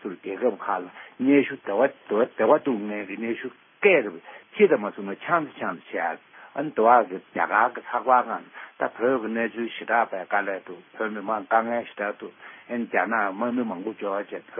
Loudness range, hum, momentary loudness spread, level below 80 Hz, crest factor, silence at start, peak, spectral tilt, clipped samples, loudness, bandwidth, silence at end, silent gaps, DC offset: 4 LU; none; 13 LU; -80 dBFS; 20 dB; 0.05 s; -4 dBFS; -10 dB/octave; under 0.1%; -25 LUFS; 3.7 kHz; 0 s; none; under 0.1%